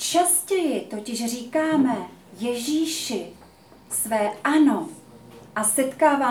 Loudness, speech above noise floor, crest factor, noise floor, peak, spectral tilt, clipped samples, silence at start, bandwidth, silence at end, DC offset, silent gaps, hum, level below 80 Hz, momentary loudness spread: -23 LUFS; 27 dB; 18 dB; -50 dBFS; -6 dBFS; -2.5 dB/octave; under 0.1%; 0 s; over 20 kHz; 0 s; under 0.1%; none; none; -66 dBFS; 12 LU